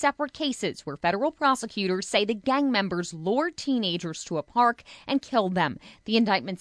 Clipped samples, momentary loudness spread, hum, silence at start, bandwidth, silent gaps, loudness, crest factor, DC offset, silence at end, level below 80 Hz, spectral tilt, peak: under 0.1%; 7 LU; none; 0 s; 11 kHz; none; -26 LUFS; 18 dB; under 0.1%; 0.05 s; -64 dBFS; -4.5 dB/octave; -8 dBFS